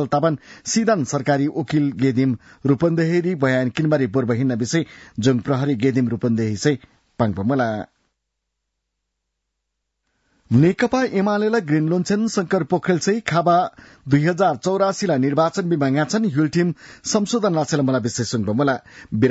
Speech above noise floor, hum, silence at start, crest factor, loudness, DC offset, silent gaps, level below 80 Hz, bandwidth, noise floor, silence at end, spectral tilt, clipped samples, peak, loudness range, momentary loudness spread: 58 dB; none; 0 s; 14 dB; -20 LUFS; under 0.1%; none; -58 dBFS; 8 kHz; -78 dBFS; 0 s; -6 dB/octave; under 0.1%; -6 dBFS; 5 LU; 5 LU